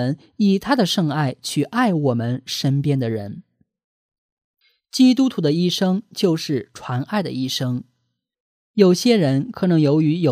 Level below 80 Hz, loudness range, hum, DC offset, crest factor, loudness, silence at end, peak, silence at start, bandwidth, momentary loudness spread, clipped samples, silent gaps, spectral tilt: -62 dBFS; 3 LU; none; under 0.1%; 18 dB; -19 LUFS; 0 s; -2 dBFS; 0 s; 15.5 kHz; 10 LU; under 0.1%; 3.84-4.09 s, 4.18-4.37 s, 4.44-4.54 s, 8.40-8.74 s; -6 dB/octave